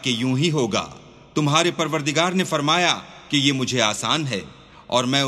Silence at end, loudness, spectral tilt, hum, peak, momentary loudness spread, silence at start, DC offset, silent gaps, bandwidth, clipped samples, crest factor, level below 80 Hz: 0 s; -21 LUFS; -4 dB/octave; none; -2 dBFS; 8 LU; 0 s; under 0.1%; none; 14 kHz; under 0.1%; 20 dB; -58 dBFS